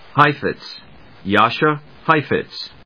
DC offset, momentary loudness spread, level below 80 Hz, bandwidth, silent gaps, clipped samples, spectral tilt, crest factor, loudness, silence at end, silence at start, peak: 0.4%; 17 LU; -54 dBFS; 5.4 kHz; none; under 0.1%; -7 dB/octave; 20 dB; -17 LUFS; 0.15 s; 0.15 s; 0 dBFS